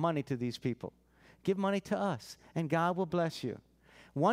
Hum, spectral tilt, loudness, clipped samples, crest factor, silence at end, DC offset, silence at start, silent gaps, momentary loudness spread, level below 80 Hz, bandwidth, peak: none; -6.5 dB/octave; -35 LUFS; under 0.1%; 18 dB; 0 s; under 0.1%; 0 s; none; 12 LU; -70 dBFS; 15.5 kHz; -16 dBFS